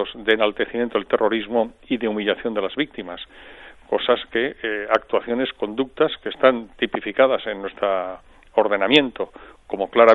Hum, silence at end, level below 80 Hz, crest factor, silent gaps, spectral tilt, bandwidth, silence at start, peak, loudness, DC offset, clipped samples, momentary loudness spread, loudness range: none; 0 s; -54 dBFS; 20 dB; none; -5.5 dB/octave; 8 kHz; 0 s; -2 dBFS; -21 LUFS; under 0.1%; under 0.1%; 12 LU; 4 LU